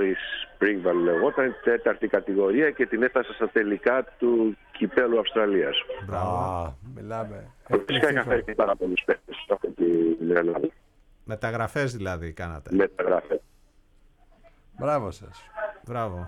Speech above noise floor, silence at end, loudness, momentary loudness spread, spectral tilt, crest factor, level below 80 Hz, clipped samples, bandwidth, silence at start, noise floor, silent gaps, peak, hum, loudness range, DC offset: 33 dB; 0 s; -25 LUFS; 12 LU; -6.5 dB/octave; 18 dB; -52 dBFS; under 0.1%; 12 kHz; 0 s; -58 dBFS; none; -8 dBFS; none; 5 LU; under 0.1%